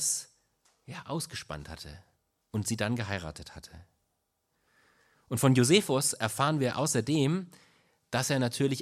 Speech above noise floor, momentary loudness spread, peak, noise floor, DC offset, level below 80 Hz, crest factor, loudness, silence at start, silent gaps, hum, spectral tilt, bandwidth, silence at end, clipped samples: 49 dB; 21 LU; -10 dBFS; -79 dBFS; under 0.1%; -62 dBFS; 22 dB; -29 LUFS; 0 s; none; none; -4.5 dB/octave; 15.5 kHz; 0 s; under 0.1%